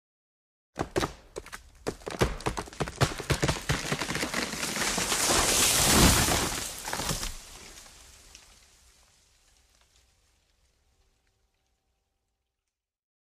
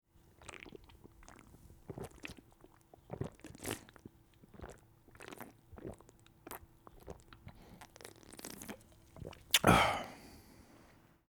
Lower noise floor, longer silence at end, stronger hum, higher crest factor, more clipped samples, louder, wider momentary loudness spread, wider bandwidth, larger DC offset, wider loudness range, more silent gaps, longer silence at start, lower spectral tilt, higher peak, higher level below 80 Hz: first, -88 dBFS vs -64 dBFS; first, 5.35 s vs 0.9 s; neither; second, 22 dB vs 30 dB; neither; first, -26 LUFS vs -35 LUFS; second, 23 LU vs 28 LU; second, 15.5 kHz vs over 20 kHz; neither; second, 13 LU vs 19 LU; neither; first, 0.75 s vs 0.4 s; about the same, -2.5 dB/octave vs -3.5 dB/octave; about the same, -8 dBFS vs -10 dBFS; first, -42 dBFS vs -58 dBFS